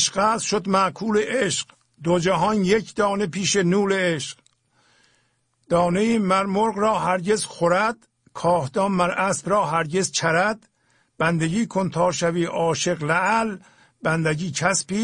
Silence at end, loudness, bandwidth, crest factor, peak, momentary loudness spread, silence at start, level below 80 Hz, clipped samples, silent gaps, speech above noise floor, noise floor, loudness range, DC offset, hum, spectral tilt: 0 s; -22 LUFS; 10.5 kHz; 18 dB; -4 dBFS; 5 LU; 0 s; -56 dBFS; under 0.1%; none; 46 dB; -67 dBFS; 2 LU; under 0.1%; none; -4.5 dB/octave